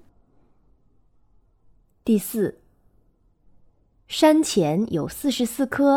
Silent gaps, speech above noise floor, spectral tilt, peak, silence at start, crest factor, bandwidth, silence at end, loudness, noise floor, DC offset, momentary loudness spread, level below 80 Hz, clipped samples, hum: none; 40 dB; -5 dB/octave; -4 dBFS; 2.05 s; 22 dB; 18.5 kHz; 0 s; -22 LUFS; -61 dBFS; under 0.1%; 10 LU; -58 dBFS; under 0.1%; none